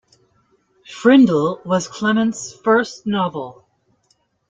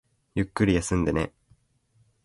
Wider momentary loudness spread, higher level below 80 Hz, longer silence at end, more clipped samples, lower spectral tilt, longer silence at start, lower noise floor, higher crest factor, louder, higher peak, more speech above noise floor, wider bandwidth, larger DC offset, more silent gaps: first, 13 LU vs 10 LU; second, -62 dBFS vs -42 dBFS; about the same, 1 s vs 0.95 s; neither; about the same, -5.5 dB/octave vs -6 dB/octave; first, 0.9 s vs 0.35 s; about the same, -64 dBFS vs -66 dBFS; about the same, 18 dB vs 20 dB; first, -17 LUFS vs -26 LUFS; first, -2 dBFS vs -8 dBFS; first, 47 dB vs 41 dB; second, 7.8 kHz vs 11.5 kHz; neither; neither